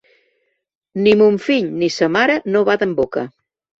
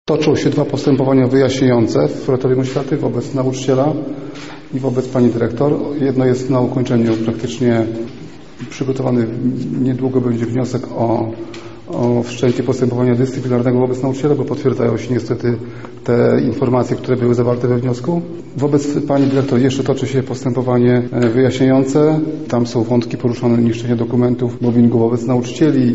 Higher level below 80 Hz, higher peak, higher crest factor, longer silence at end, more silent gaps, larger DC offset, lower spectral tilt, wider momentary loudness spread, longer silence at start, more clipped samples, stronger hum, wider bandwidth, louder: second, -56 dBFS vs -48 dBFS; about the same, -2 dBFS vs -2 dBFS; about the same, 16 dB vs 14 dB; first, 0.5 s vs 0 s; neither; second, under 0.1% vs 1%; second, -5.5 dB/octave vs -7.5 dB/octave; first, 11 LU vs 8 LU; first, 0.95 s vs 0.05 s; neither; neither; about the same, 7.6 kHz vs 8 kHz; about the same, -16 LUFS vs -16 LUFS